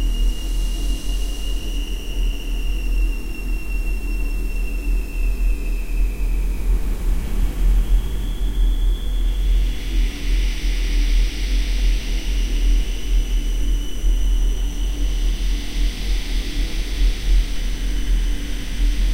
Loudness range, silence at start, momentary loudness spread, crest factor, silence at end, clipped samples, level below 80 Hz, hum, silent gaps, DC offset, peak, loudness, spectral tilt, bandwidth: 3 LU; 0 s; 5 LU; 12 dB; 0 s; under 0.1%; -20 dBFS; none; none; under 0.1%; -6 dBFS; -25 LUFS; -4.5 dB/octave; 15.5 kHz